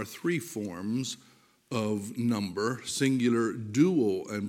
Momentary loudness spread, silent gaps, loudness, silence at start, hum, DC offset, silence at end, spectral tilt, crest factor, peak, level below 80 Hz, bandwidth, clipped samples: 10 LU; none; -29 LUFS; 0 s; none; under 0.1%; 0 s; -5.5 dB/octave; 18 dB; -12 dBFS; -74 dBFS; 17 kHz; under 0.1%